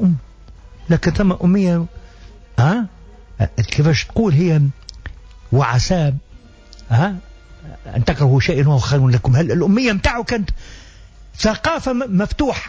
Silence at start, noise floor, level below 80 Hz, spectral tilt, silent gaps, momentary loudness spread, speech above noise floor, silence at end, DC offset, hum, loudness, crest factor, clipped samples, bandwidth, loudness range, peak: 0 s; -41 dBFS; -32 dBFS; -6.5 dB/octave; none; 13 LU; 26 dB; 0 s; under 0.1%; none; -17 LUFS; 14 dB; under 0.1%; 8 kHz; 3 LU; -4 dBFS